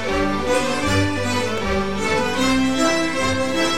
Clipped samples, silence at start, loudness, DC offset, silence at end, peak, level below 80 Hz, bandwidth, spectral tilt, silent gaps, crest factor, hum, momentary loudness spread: under 0.1%; 0 s; -20 LUFS; 3%; 0 s; -6 dBFS; -38 dBFS; 16 kHz; -4 dB/octave; none; 14 dB; none; 3 LU